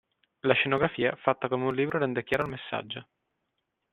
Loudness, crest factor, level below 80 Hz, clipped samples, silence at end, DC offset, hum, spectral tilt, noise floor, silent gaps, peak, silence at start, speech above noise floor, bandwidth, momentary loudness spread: -28 LUFS; 24 dB; -64 dBFS; under 0.1%; 0.9 s; under 0.1%; none; -7 dB/octave; -81 dBFS; none; -6 dBFS; 0.45 s; 53 dB; 11.5 kHz; 10 LU